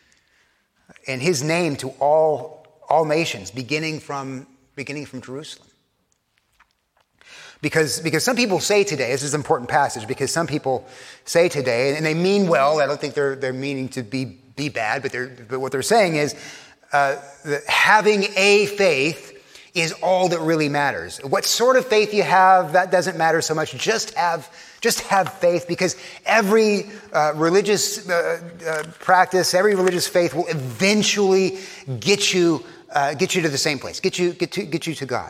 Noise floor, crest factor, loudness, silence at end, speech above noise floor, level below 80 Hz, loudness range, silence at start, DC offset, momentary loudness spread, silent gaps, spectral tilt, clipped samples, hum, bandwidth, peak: -68 dBFS; 20 dB; -20 LUFS; 0 s; 48 dB; -64 dBFS; 7 LU; 1.05 s; under 0.1%; 13 LU; none; -3.5 dB/octave; under 0.1%; none; 16 kHz; 0 dBFS